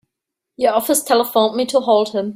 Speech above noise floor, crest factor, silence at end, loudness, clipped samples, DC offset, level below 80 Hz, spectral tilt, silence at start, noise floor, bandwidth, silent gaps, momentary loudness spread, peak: 65 dB; 16 dB; 0 s; -16 LUFS; under 0.1%; under 0.1%; -64 dBFS; -3 dB/octave; 0.6 s; -81 dBFS; 16 kHz; none; 3 LU; -2 dBFS